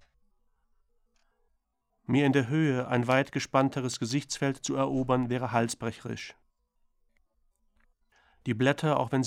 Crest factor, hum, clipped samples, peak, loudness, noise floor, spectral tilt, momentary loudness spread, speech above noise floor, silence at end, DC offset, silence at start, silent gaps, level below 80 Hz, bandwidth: 20 dB; none; under 0.1%; -10 dBFS; -28 LUFS; -77 dBFS; -5.5 dB/octave; 12 LU; 49 dB; 0 s; under 0.1%; 2.1 s; none; -62 dBFS; 13.5 kHz